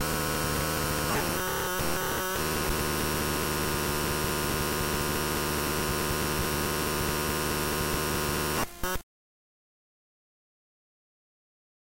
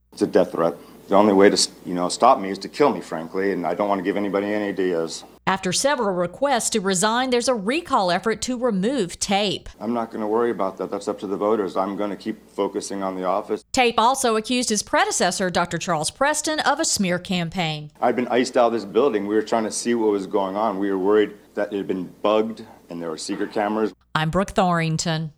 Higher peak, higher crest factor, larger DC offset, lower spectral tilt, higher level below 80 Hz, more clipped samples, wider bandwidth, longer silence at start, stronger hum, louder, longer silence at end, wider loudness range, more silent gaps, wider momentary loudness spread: second, -16 dBFS vs 0 dBFS; second, 14 dB vs 22 dB; neither; about the same, -3.5 dB/octave vs -4 dB/octave; first, -42 dBFS vs -54 dBFS; neither; about the same, 16 kHz vs 16 kHz; second, 0 s vs 0.15 s; neither; second, -28 LUFS vs -22 LUFS; first, 3 s vs 0.05 s; about the same, 6 LU vs 4 LU; neither; second, 1 LU vs 9 LU